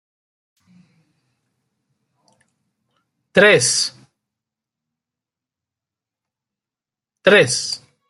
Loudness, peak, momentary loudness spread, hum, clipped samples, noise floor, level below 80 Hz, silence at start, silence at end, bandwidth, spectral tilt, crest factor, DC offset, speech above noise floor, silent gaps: -15 LUFS; -2 dBFS; 11 LU; none; under 0.1%; -89 dBFS; -66 dBFS; 3.35 s; 0.3 s; 12 kHz; -2.5 dB/octave; 22 dB; under 0.1%; 75 dB; none